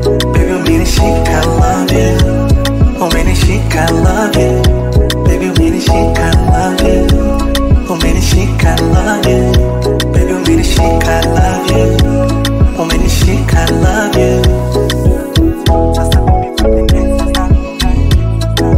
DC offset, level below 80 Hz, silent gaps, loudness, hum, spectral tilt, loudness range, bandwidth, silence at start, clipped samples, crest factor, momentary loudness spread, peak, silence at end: under 0.1%; -14 dBFS; none; -11 LUFS; none; -6 dB/octave; 1 LU; 16 kHz; 0 s; under 0.1%; 8 dB; 2 LU; 0 dBFS; 0 s